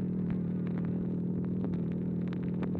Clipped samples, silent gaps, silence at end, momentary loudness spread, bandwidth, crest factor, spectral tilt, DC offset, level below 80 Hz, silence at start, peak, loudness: under 0.1%; none; 0 s; 1 LU; 4.2 kHz; 12 dB; -11.5 dB/octave; under 0.1%; -54 dBFS; 0 s; -22 dBFS; -34 LUFS